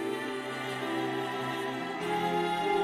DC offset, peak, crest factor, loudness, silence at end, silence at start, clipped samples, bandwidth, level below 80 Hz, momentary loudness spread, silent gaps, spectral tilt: under 0.1%; -18 dBFS; 14 dB; -32 LUFS; 0 s; 0 s; under 0.1%; 16 kHz; -68 dBFS; 5 LU; none; -5 dB/octave